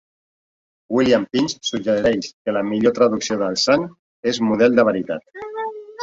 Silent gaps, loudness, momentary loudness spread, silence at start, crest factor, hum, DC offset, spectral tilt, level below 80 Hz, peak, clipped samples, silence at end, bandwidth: 2.33-2.45 s, 3.99-4.23 s; -19 LUFS; 12 LU; 0.9 s; 16 dB; none; under 0.1%; -4.5 dB/octave; -54 dBFS; -2 dBFS; under 0.1%; 0 s; 7.8 kHz